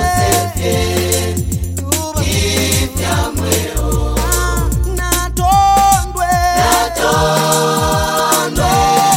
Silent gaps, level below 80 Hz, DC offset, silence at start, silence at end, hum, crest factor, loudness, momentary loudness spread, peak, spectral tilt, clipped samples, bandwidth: none; -22 dBFS; under 0.1%; 0 s; 0 s; none; 14 dB; -14 LUFS; 6 LU; 0 dBFS; -3.5 dB/octave; under 0.1%; 17 kHz